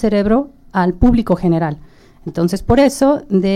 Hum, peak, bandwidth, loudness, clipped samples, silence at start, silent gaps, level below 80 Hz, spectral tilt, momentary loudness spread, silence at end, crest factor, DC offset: none; -2 dBFS; 13.5 kHz; -15 LUFS; under 0.1%; 0 s; none; -28 dBFS; -7 dB/octave; 10 LU; 0 s; 12 dB; under 0.1%